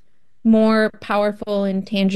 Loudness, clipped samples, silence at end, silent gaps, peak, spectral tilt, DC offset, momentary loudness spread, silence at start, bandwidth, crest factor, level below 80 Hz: -19 LUFS; under 0.1%; 0 s; none; -6 dBFS; -7 dB/octave; under 0.1%; 7 LU; 0.45 s; 12 kHz; 14 dB; -54 dBFS